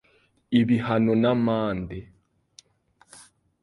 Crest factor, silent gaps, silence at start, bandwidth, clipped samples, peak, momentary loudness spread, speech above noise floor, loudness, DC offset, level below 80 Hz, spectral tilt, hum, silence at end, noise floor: 18 dB; none; 0.5 s; 11.5 kHz; under 0.1%; -8 dBFS; 13 LU; 40 dB; -23 LUFS; under 0.1%; -54 dBFS; -7.5 dB/octave; none; 1.6 s; -63 dBFS